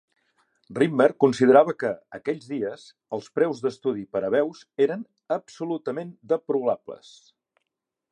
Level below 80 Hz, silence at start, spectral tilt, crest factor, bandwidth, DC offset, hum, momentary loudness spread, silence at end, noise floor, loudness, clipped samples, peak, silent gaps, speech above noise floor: -72 dBFS; 0.7 s; -6.5 dB/octave; 22 dB; 9.8 kHz; under 0.1%; none; 16 LU; 1.15 s; -83 dBFS; -24 LUFS; under 0.1%; -4 dBFS; none; 59 dB